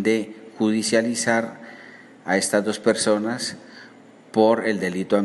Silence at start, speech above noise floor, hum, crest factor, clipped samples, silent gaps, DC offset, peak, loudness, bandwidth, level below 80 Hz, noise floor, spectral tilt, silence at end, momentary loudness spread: 0 s; 26 dB; none; 18 dB; under 0.1%; none; under 0.1%; -4 dBFS; -22 LUFS; 12 kHz; -70 dBFS; -47 dBFS; -4 dB/octave; 0 s; 18 LU